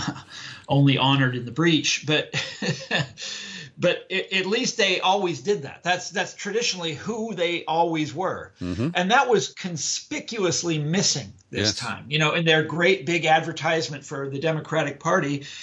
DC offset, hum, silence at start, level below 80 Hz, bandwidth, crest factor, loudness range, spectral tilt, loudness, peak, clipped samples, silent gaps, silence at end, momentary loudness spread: under 0.1%; none; 0 s; -64 dBFS; 9.6 kHz; 18 dB; 3 LU; -4 dB/octave; -23 LUFS; -6 dBFS; under 0.1%; none; 0 s; 11 LU